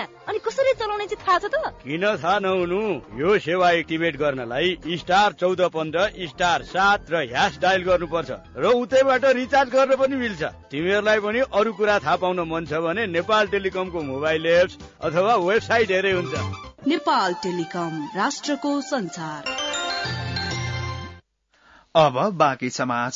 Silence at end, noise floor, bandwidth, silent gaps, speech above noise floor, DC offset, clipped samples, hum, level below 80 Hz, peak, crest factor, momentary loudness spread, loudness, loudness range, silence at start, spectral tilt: 0 s; -60 dBFS; 7.8 kHz; none; 38 dB; under 0.1%; under 0.1%; none; -52 dBFS; -4 dBFS; 18 dB; 9 LU; -22 LUFS; 5 LU; 0 s; -4.5 dB/octave